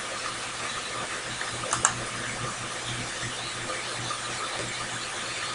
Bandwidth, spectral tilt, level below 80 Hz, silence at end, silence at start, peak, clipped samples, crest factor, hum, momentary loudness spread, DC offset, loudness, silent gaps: 16 kHz; -1.5 dB/octave; -56 dBFS; 0 s; 0 s; -2 dBFS; under 0.1%; 30 dB; none; 6 LU; under 0.1%; -30 LUFS; none